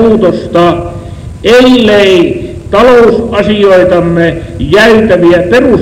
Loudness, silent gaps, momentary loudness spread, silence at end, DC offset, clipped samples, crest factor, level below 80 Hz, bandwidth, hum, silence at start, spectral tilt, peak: -6 LUFS; none; 11 LU; 0 s; under 0.1%; 6%; 6 dB; -28 dBFS; 15.5 kHz; none; 0 s; -6 dB/octave; 0 dBFS